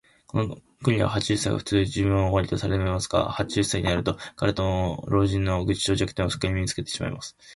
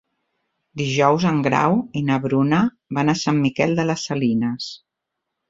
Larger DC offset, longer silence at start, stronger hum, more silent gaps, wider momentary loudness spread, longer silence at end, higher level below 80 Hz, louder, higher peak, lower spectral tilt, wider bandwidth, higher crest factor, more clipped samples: neither; second, 0.35 s vs 0.75 s; neither; neither; about the same, 6 LU vs 7 LU; second, 0 s vs 0.75 s; first, -40 dBFS vs -58 dBFS; second, -25 LUFS vs -20 LUFS; second, -8 dBFS vs -2 dBFS; about the same, -5.5 dB/octave vs -6 dB/octave; first, 11.5 kHz vs 7.8 kHz; about the same, 18 dB vs 18 dB; neither